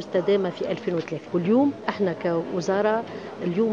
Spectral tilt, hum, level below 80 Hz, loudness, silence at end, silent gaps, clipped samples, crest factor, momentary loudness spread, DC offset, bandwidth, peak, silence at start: -7 dB/octave; none; -68 dBFS; -25 LUFS; 0 s; none; under 0.1%; 18 dB; 7 LU; under 0.1%; 7.6 kHz; -6 dBFS; 0 s